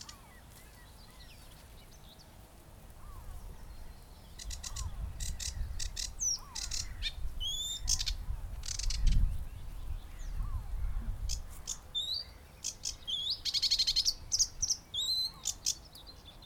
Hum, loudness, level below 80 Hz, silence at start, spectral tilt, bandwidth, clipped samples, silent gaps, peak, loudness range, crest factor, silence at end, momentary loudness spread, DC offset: none; -34 LUFS; -40 dBFS; 0 s; -1 dB/octave; 18.5 kHz; under 0.1%; none; -16 dBFS; 22 LU; 20 dB; 0 s; 24 LU; under 0.1%